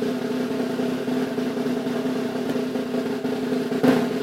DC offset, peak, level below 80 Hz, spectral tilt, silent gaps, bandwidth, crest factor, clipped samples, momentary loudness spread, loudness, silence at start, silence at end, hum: under 0.1%; -6 dBFS; -64 dBFS; -6 dB/octave; none; 16 kHz; 18 dB; under 0.1%; 6 LU; -25 LUFS; 0 s; 0 s; none